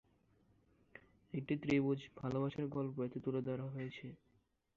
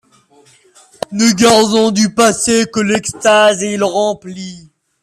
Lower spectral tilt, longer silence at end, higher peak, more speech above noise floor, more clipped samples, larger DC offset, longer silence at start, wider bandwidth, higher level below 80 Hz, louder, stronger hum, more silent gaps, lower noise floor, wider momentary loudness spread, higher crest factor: first, -7 dB/octave vs -3.5 dB/octave; first, 0.6 s vs 0.45 s; second, -22 dBFS vs 0 dBFS; about the same, 37 dB vs 36 dB; neither; neither; second, 0.95 s vs 1.1 s; second, 7.4 kHz vs 14 kHz; second, -72 dBFS vs -52 dBFS; second, -40 LUFS vs -12 LUFS; neither; neither; first, -77 dBFS vs -49 dBFS; about the same, 16 LU vs 16 LU; first, 20 dB vs 14 dB